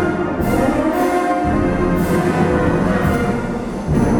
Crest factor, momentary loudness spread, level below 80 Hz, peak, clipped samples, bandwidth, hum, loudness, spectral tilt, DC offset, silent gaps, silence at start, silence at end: 12 dB; 4 LU; -30 dBFS; -4 dBFS; under 0.1%; 19 kHz; none; -17 LUFS; -7.5 dB/octave; under 0.1%; none; 0 s; 0 s